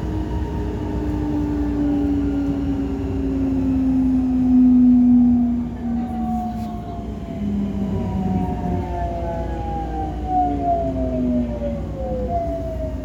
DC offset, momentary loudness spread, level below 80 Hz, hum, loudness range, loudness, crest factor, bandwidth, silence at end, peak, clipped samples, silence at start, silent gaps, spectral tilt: under 0.1%; 12 LU; -30 dBFS; none; 7 LU; -21 LUFS; 12 dB; 7.4 kHz; 0 s; -8 dBFS; under 0.1%; 0 s; none; -9.5 dB/octave